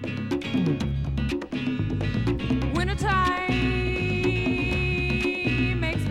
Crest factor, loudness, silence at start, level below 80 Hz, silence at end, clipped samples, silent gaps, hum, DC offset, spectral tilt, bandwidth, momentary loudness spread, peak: 14 dB; -25 LUFS; 0 s; -34 dBFS; 0 s; under 0.1%; none; none; under 0.1%; -6.5 dB/octave; 13 kHz; 5 LU; -10 dBFS